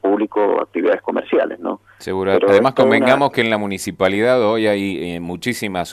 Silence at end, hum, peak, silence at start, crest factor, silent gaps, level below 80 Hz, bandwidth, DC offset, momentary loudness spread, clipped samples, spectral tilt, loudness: 0 s; none; 0 dBFS; 0.05 s; 16 dB; none; -56 dBFS; 13.5 kHz; under 0.1%; 11 LU; under 0.1%; -5.5 dB/octave; -17 LUFS